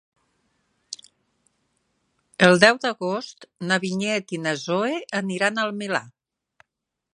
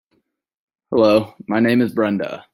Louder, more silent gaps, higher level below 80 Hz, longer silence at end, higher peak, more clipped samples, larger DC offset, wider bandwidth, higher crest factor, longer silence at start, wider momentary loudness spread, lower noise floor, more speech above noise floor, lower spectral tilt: second, -22 LUFS vs -18 LUFS; neither; second, -70 dBFS vs -60 dBFS; first, 1.05 s vs 0.15 s; about the same, 0 dBFS vs -2 dBFS; neither; neither; second, 11 kHz vs 16 kHz; first, 24 dB vs 16 dB; about the same, 0.9 s vs 0.9 s; first, 23 LU vs 8 LU; first, -82 dBFS vs -68 dBFS; first, 60 dB vs 51 dB; second, -4.5 dB/octave vs -7 dB/octave